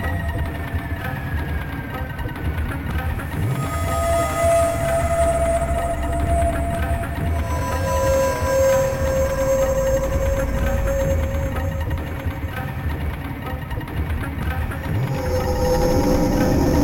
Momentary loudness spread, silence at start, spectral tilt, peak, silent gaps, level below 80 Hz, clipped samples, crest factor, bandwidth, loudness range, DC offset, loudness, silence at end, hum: 9 LU; 0 s; -6 dB/octave; -6 dBFS; none; -26 dBFS; under 0.1%; 14 dB; 17 kHz; 6 LU; 0.4%; -22 LUFS; 0 s; none